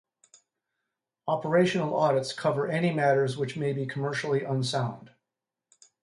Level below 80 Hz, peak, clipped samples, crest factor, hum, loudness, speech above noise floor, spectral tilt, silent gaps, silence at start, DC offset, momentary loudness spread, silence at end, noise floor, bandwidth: -72 dBFS; -12 dBFS; under 0.1%; 18 dB; none; -27 LUFS; 61 dB; -6 dB/octave; none; 1.25 s; under 0.1%; 7 LU; 0.95 s; -88 dBFS; 11.5 kHz